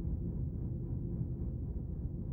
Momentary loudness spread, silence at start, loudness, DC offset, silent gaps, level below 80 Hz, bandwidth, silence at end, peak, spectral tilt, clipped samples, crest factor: 2 LU; 0 s; -40 LUFS; under 0.1%; none; -42 dBFS; 1.7 kHz; 0 s; -26 dBFS; -14 dB/octave; under 0.1%; 12 dB